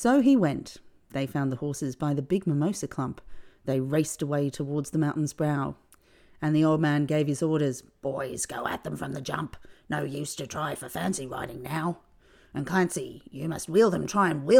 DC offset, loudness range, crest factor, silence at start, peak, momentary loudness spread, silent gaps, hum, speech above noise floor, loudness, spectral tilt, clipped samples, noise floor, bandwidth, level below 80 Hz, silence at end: under 0.1%; 6 LU; 20 dB; 0 s; -6 dBFS; 12 LU; none; none; 31 dB; -28 LUFS; -6 dB/octave; under 0.1%; -58 dBFS; 17 kHz; -58 dBFS; 0 s